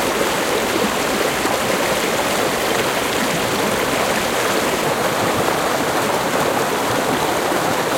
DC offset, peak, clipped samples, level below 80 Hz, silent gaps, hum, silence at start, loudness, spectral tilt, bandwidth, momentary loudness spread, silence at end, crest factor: under 0.1%; -2 dBFS; under 0.1%; -46 dBFS; none; none; 0 s; -18 LUFS; -3 dB/octave; 16.5 kHz; 1 LU; 0 s; 16 dB